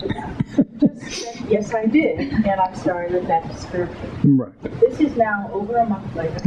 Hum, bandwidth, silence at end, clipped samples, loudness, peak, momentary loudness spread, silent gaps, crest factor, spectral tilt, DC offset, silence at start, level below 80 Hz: none; 9.4 kHz; 0 s; under 0.1%; -21 LUFS; -4 dBFS; 9 LU; none; 16 dB; -7 dB/octave; under 0.1%; 0 s; -44 dBFS